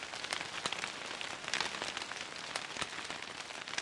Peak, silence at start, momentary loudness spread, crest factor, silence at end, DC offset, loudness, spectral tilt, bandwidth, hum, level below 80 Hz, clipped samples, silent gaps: -14 dBFS; 0 s; 6 LU; 28 dB; 0 s; under 0.1%; -39 LUFS; -0.5 dB/octave; 11.5 kHz; none; -72 dBFS; under 0.1%; none